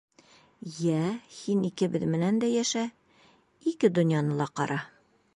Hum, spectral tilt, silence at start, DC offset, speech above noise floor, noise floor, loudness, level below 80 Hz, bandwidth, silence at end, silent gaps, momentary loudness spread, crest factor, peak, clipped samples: none; -6 dB/octave; 0.65 s; under 0.1%; 34 dB; -62 dBFS; -28 LUFS; -70 dBFS; 11.5 kHz; 0.5 s; none; 11 LU; 18 dB; -10 dBFS; under 0.1%